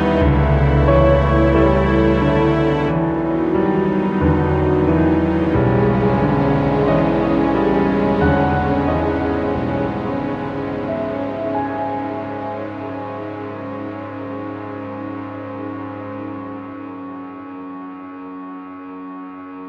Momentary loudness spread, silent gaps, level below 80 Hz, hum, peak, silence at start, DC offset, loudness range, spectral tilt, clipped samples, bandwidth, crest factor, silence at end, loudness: 17 LU; none; -28 dBFS; none; -2 dBFS; 0 s; under 0.1%; 14 LU; -9.5 dB/octave; under 0.1%; 7 kHz; 16 dB; 0 s; -18 LUFS